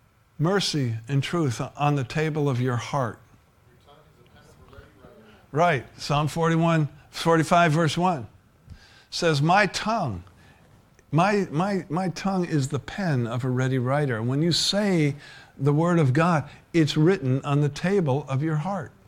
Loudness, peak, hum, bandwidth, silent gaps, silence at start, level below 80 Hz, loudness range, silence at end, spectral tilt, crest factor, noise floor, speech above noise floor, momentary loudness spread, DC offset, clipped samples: -24 LUFS; -6 dBFS; none; 14.5 kHz; none; 0.4 s; -54 dBFS; 6 LU; 0.2 s; -6 dB/octave; 20 dB; -57 dBFS; 34 dB; 8 LU; under 0.1%; under 0.1%